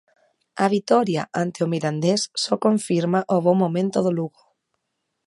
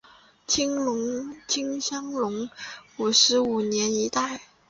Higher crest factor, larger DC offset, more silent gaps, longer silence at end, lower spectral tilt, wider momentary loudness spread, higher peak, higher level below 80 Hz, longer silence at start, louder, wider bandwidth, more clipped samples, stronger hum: about the same, 18 dB vs 20 dB; neither; neither; first, 1 s vs 0.25 s; first, -5.5 dB/octave vs -2 dB/octave; second, 5 LU vs 15 LU; about the same, -4 dBFS vs -6 dBFS; second, -70 dBFS vs -64 dBFS; about the same, 0.55 s vs 0.5 s; first, -21 LUFS vs -24 LUFS; first, 11.5 kHz vs 7.8 kHz; neither; neither